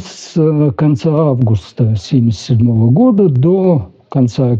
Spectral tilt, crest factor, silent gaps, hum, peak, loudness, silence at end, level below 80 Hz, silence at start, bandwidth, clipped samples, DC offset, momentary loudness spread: -9 dB/octave; 10 dB; none; none; -2 dBFS; -12 LUFS; 0 s; -46 dBFS; 0 s; 7.8 kHz; under 0.1%; under 0.1%; 6 LU